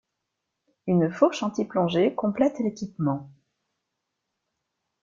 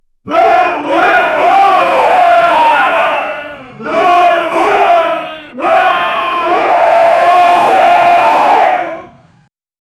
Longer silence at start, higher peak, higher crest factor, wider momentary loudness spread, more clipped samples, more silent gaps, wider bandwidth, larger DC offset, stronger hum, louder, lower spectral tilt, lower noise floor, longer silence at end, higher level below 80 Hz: first, 0.85 s vs 0.25 s; second, -6 dBFS vs 0 dBFS; first, 20 dB vs 10 dB; second, 7 LU vs 10 LU; neither; neither; second, 7.6 kHz vs 13 kHz; neither; neither; second, -25 LUFS vs -9 LUFS; first, -7 dB/octave vs -3.5 dB/octave; first, -82 dBFS vs -51 dBFS; first, 1.75 s vs 0.95 s; second, -68 dBFS vs -52 dBFS